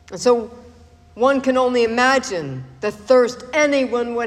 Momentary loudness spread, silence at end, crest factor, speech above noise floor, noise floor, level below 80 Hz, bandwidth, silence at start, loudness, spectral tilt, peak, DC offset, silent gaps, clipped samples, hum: 11 LU; 0 s; 16 dB; 28 dB; -46 dBFS; -52 dBFS; 11.5 kHz; 0.1 s; -18 LUFS; -4 dB/octave; -4 dBFS; under 0.1%; none; under 0.1%; none